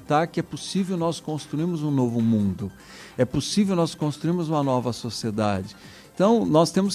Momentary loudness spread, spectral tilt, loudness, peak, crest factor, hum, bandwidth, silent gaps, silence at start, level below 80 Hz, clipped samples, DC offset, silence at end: 12 LU; -6 dB/octave; -24 LUFS; -6 dBFS; 18 dB; none; 14.5 kHz; none; 0 s; -52 dBFS; under 0.1%; under 0.1%; 0 s